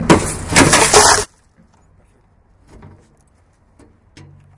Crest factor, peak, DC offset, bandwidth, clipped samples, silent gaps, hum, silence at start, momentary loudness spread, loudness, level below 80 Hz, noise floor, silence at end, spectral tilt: 16 dB; 0 dBFS; under 0.1%; 12 kHz; 0.1%; none; none; 0 s; 7 LU; -10 LUFS; -36 dBFS; -54 dBFS; 3.3 s; -2.5 dB/octave